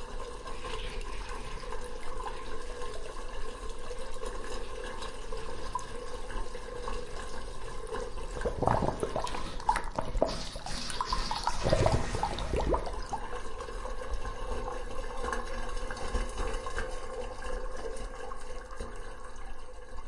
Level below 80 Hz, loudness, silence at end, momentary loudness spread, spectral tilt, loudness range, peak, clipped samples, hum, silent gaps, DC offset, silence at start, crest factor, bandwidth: -38 dBFS; -37 LUFS; 0 s; 11 LU; -4.5 dB/octave; 9 LU; -10 dBFS; under 0.1%; none; none; under 0.1%; 0 s; 24 dB; 11.5 kHz